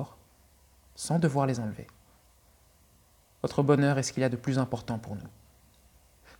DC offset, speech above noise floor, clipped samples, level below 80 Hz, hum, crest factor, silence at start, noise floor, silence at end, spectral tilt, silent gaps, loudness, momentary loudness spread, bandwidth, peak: under 0.1%; 34 dB; under 0.1%; -62 dBFS; none; 22 dB; 0 s; -62 dBFS; 1.1 s; -6 dB/octave; none; -29 LUFS; 18 LU; 18 kHz; -10 dBFS